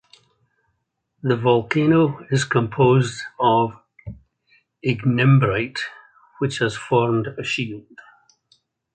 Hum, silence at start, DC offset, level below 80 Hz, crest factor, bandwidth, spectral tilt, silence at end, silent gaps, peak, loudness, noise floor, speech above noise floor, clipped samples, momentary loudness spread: none; 1.25 s; under 0.1%; -54 dBFS; 18 dB; 9.2 kHz; -6.5 dB/octave; 1.15 s; none; -2 dBFS; -20 LUFS; -73 dBFS; 54 dB; under 0.1%; 14 LU